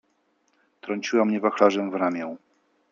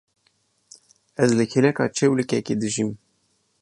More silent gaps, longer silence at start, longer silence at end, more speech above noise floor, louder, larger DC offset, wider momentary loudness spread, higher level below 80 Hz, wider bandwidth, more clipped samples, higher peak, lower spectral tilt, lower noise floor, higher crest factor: neither; second, 0.85 s vs 1.2 s; about the same, 0.55 s vs 0.65 s; about the same, 46 dB vs 47 dB; about the same, -24 LUFS vs -22 LUFS; neither; first, 17 LU vs 9 LU; second, -76 dBFS vs -64 dBFS; second, 7.4 kHz vs 11 kHz; neither; about the same, -4 dBFS vs -4 dBFS; about the same, -5.5 dB/octave vs -5.5 dB/octave; about the same, -69 dBFS vs -68 dBFS; about the same, 22 dB vs 18 dB